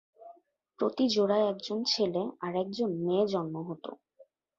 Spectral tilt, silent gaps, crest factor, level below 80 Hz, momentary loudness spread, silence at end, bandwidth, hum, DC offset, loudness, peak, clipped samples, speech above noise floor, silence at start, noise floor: -5.5 dB/octave; none; 16 dB; -74 dBFS; 11 LU; 0.35 s; 7.6 kHz; none; under 0.1%; -30 LUFS; -16 dBFS; under 0.1%; 32 dB; 0.2 s; -62 dBFS